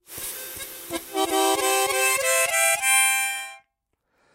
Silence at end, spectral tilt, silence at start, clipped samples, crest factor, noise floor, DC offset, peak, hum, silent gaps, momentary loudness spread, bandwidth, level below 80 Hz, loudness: 0.75 s; 0.5 dB/octave; 0.1 s; under 0.1%; 18 dB; -76 dBFS; under 0.1%; -8 dBFS; none; none; 15 LU; 16 kHz; -62 dBFS; -20 LUFS